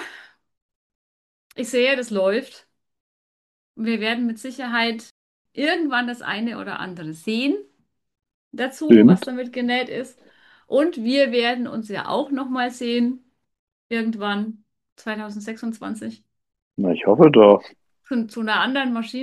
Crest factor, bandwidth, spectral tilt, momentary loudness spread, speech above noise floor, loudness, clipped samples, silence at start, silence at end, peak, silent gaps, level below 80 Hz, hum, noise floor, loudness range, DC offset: 22 dB; 12.5 kHz; -6 dB/octave; 18 LU; 26 dB; -20 LUFS; under 0.1%; 0 s; 0 s; 0 dBFS; 0.62-0.69 s, 0.75-1.50 s, 3.00-3.74 s, 5.11-5.45 s, 8.34-8.51 s, 13.59-13.90 s, 14.92-14.96 s, 16.62-16.71 s; -68 dBFS; none; -46 dBFS; 8 LU; under 0.1%